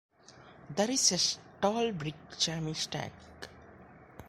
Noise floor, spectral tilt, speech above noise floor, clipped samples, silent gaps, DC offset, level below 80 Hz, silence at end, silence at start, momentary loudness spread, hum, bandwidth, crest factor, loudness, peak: -56 dBFS; -2.5 dB/octave; 24 dB; under 0.1%; none; under 0.1%; -64 dBFS; 0 s; 0.3 s; 23 LU; none; 16.5 kHz; 24 dB; -31 LUFS; -10 dBFS